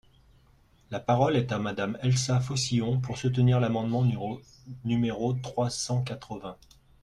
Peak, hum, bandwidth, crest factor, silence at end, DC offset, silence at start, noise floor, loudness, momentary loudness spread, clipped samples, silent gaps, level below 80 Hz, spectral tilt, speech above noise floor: -12 dBFS; none; 11 kHz; 16 dB; 0.5 s; under 0.1%; 0.9 s; -61 dBFS; -28 LUFS; 14 LU; under 0.1%; none; -56 dBFS; -6 dB/octave; 33 dB